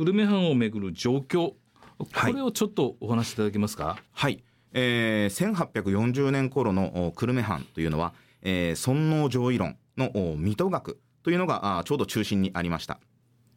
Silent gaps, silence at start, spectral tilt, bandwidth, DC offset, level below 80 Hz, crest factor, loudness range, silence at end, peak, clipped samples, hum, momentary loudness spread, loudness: none; 0 s; -6 dB/octave; 16.5 kHz; under 0.1%; -54 dBFS; 14 dB; 2 LU; 0.6 s; -12 dBFS; under 0.1%; none; 9 LU; -27 LUFS